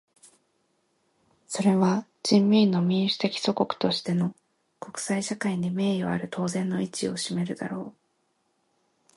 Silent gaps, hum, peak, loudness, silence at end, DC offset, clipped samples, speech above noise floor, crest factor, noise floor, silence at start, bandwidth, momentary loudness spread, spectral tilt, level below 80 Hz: none; none; -8 dBFS; -26 LUFS; 1.25 s; under 0.1%; under 0.1%; 47 dB; 18 dB; -72 dBFS; 1.5 s; 11.5 kHz; 13 LU; -5.5 dB/octave; -68 dBFS